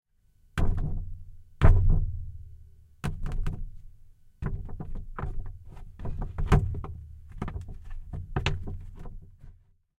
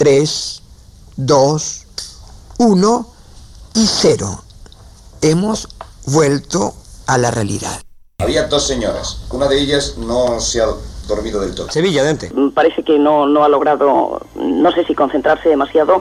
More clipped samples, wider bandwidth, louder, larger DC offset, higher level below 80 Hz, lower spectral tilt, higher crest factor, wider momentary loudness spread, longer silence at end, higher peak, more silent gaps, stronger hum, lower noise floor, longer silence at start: neither; second, 7.6 kHz vs 13.5 kHz; second, -32 LUFS vs -15 LUFS; neither; first, -30 dBFS vs -36 dBFS; first, -7.5 dB/octave vs -4.5 dB/octave; first, 22 dB vs 14 dB; first, 22 LU vs 13 LU; first, 0.45 s vs 0 s; second, -6 dBFS vs -2 dBFS; neither; neither; first, -62 dBFS vs -40 dBFS; first, 0.55 s vs 0 s